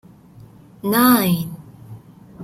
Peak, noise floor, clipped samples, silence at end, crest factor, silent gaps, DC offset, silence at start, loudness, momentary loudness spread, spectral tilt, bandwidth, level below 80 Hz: -2 dBFS; -44 dBFS; under 0.1%; 0 s; 20 dB; none; under 0.1%; 0.85 s; -17 LUFS; 24 LU; -5 dB/octave; 16.5 kHz; -56 dBFS